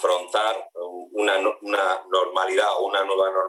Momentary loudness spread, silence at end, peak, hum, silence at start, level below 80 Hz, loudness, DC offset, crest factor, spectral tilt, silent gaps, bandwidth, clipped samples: 10 LU; 0 s; -10 dBFS; none; 0 s; -80 dBFS; -23 LUFS; under 0.1%; 14 dB; -0.5 dB/octave; none; 12.5 kHz; under 0.1%